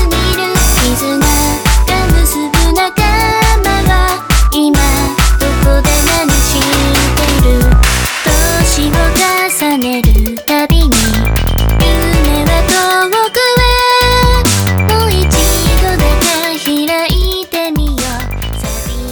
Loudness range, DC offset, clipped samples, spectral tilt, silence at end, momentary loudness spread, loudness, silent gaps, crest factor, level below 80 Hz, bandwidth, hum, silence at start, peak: 2 LU; under 0.1%; under 0.1%; -4 dB/octave; 0 s; 4 LU; -11 LUFS; none; 10 dB; -14 dBFS; over 20 kHz; none; 0 s; 0 dBFS